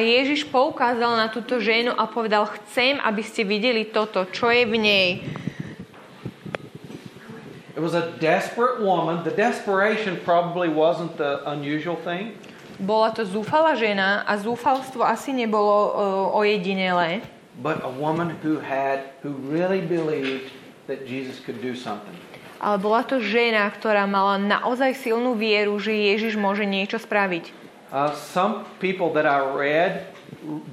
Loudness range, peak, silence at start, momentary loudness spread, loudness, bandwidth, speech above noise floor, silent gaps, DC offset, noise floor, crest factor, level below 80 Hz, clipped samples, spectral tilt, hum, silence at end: 6 LU; -4 dBFS; 0 s; 15 LU; -22 LUFS; 14 kHz; 20 dB; none; under 0.1%; -42 dBFS; 18 dB; -68 dBFS; under 0.1%; -5.5 dB/octave; none; 0 s